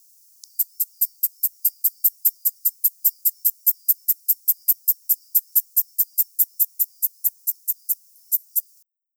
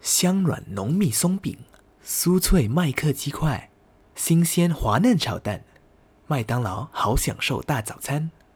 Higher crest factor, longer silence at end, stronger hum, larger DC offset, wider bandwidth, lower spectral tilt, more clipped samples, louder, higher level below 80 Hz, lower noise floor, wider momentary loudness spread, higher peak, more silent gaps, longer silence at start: about the same, 20 dB vs 18 dB; first, 0.55 s vs 0.25 s; neither; neither; about the same, over 20 kHz vs over 20 kHz; second, 10.5 dB/octave vs -5 dB/octave; neither; first, -20 LUFS vs -23 LUFS; second, under -90 dBFS vs -36 dBFS; about the same, -59 dBFS vs -56 dBFS; second, 6 LU vs 10 LU; about the same, -4 dBFS vs -6 dBFS; neither; first, 0.6 s vs 0.05 s